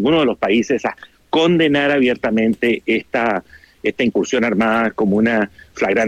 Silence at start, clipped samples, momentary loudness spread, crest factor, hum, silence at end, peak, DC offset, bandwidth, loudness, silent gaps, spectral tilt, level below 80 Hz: 0 s; under 0.1%; 7 LU; 12 dB; none; 0 s; -6 dBFS; under 0.1%; 8.8 kHz; -17 LUFS; none; -5.5 dB/octave; -52 dBFS